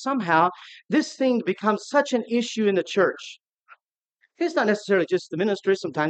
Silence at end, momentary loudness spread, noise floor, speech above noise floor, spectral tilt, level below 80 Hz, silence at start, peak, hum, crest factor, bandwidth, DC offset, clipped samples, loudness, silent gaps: 0 s; 5 LU; -70 dBFS; 47 dB; -5 dB/octave; -82 dBFS; 0 s; -4 dBFS; none; 18 dB; 9 kHz; under 0.1%; under 0.1%; -23 LUFS; 3.53-3.57 s